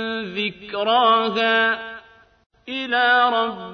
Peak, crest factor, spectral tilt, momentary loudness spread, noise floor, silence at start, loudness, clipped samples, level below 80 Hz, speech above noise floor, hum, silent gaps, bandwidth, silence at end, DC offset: -6 dBFS; 16 dB; -5 dB/octave; 13 LU; -48 dBFS; 0 s; -19 LUFS; under 0.1%; -62 dBFS; 28 dB; none; 2.46-2.50 s; 6.6 kHz; 0 s; under 0.1%